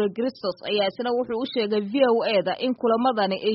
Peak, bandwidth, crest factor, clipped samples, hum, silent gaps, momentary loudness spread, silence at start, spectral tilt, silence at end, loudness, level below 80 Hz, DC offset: -8 dBFS; 5.8 kHz; 16 dB; under 0.1%; none; none; 6 LU; 0 s; -3 dB/octave; 0 s; -24 LUFS; -68 dBFS; under 0.1%